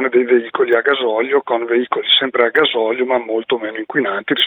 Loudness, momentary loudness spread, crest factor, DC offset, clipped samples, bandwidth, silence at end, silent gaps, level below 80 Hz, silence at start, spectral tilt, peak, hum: -16 LUFS; 6 LU; 16 dB; under 0.1%; under 0.1%; 16 kHz; 0 s; none; -68 dBFS; 0 s; -6 dB/octave; 0 dBFS; none